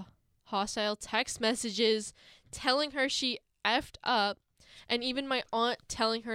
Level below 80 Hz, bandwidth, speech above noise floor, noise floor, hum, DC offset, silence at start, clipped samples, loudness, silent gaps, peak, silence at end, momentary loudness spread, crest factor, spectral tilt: -62 dBFS; 15.5 kHz; 23 dB; -55 dBFS; none; under 0.1%; 0 s; under 0.1%; -31 LUFS; none; -14 dBFS; 0 s; 5 LU; 20 dB; -2 dB/octave